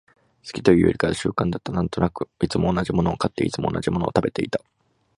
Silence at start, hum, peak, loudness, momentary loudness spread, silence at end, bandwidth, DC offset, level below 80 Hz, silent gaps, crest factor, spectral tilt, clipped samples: 0.45 s; none; 0 dBFS; -23 LUFS; 9 LU; 0.6 s; 11.5 kHz; under 0.1%; -42 dBFS; none; 22 dB; -6.5 dB/octave; under 0.1%